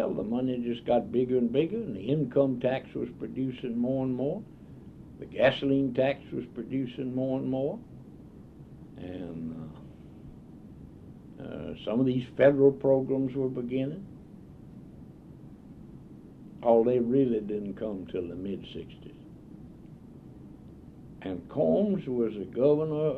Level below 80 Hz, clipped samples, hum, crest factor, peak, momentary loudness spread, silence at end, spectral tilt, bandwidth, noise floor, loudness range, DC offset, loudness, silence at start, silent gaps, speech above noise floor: -58 dBFS; under 0.1%; none; 22 dB; -8 dBFS; 24 LU; 0 s; -9 dB/octave; 5 kHz; -49 dBFS; 14 LU; under 0.1%; -29 LUFS; 0 s; none; 21 dB